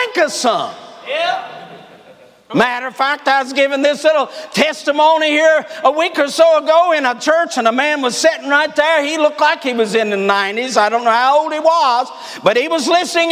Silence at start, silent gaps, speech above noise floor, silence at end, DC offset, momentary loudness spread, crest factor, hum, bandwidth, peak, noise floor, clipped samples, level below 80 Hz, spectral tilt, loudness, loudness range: 0 s; none; 29 dB; 0 s; under 0.1%; 7 LU; 14 dB; none; 16 kHz; 0 dBFS; -44 dBFS; under 0.1%; -68 dBFS; -2.5 dB/octave; -14 LUFS; 4 LU